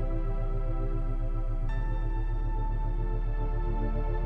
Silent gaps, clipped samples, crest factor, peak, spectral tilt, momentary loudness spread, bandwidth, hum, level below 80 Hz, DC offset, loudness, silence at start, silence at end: none; under 0.1%; 8 dB; -20 dBFS; -9.5 dB/octave; 2 LU; 3.8 kHz; none; -28 dBFS; under 0.1%; -34 LUFS; 0 s; 0 s